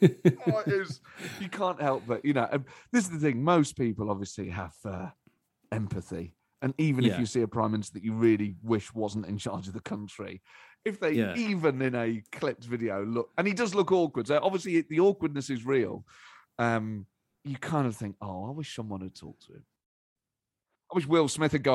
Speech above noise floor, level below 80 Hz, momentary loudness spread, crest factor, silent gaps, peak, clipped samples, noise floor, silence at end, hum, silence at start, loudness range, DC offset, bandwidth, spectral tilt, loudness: 60 dB; -64 dBFS; 14 LU; 24 dB; 19.86-20.16 s; -6 dBFS; under 0.1%; -89 dBFS; 0 s; none; 0 s; 7 LU; under 0.1%; 13 kHz; -6.5 dB/octave; -29 LUFS